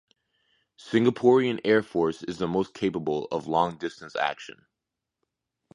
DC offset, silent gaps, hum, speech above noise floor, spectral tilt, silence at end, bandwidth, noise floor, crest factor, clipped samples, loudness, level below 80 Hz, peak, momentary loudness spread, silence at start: under 0.1%; none; none; 61 dB; -6.5 dB/octave; 1.25 s; 10.5 kHz; -86 dBFS; 20 dB; under 0.1%; -26 LUFS; -62 dBFS; -8 dBFS; 11 LU; 0.85 s